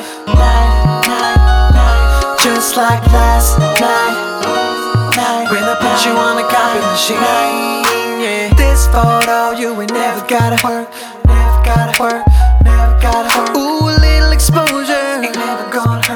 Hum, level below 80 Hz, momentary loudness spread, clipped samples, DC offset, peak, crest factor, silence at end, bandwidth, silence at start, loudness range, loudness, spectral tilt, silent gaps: none; -14 dBFS; 6 LU; under 0.1%; under 0.1%; 0 dBFS; 10 dB; 0 s; 19.5 kHz; 0 s; 2 LU; -12 LUFS; -4.5 dB/octave; none